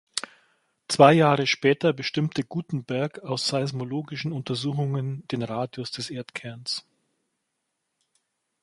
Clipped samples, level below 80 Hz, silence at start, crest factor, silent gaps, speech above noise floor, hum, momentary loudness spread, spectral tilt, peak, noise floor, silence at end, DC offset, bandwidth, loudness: under 0.1%; -68 dBFS; 0.15 s; 24 dB; none; 55 dB; none; 15 LU; -5.5 dB/octave; -2 dBFS; -79 dBFS; 1.85 s; under 0.1%; 11.5 kHz; -25 LUFS